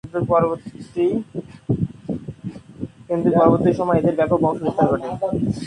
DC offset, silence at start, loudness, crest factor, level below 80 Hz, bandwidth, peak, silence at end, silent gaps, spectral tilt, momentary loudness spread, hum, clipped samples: under 0.1%; 0.05 s; -20 LUFS; 20 dB; -46 dBFS; 10.5 kHz; 0 dBFS; 0 s; none; -9 dB/octave; 18 LU; none; under 0.1%